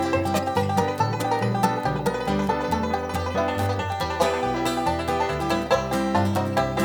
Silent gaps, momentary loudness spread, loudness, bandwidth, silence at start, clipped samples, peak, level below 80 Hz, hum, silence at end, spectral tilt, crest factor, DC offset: none; 3 LU; -24 LUFS; 19 kHz; 0 s; under 0.1%; -6 dBFS; -44 dBFS; none; 0 s; -5.5 dB/octave; 18 dB; under 0.1%